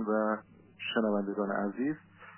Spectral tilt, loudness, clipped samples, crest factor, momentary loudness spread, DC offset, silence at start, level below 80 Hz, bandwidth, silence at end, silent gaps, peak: -4 dB/octave; -33 LUFS; under 0.1%; 18 dB; 8 LU; under 0.1%; 0 s; -78 dBFS; 3.2 kHz; 0 s; none; -14 dBFS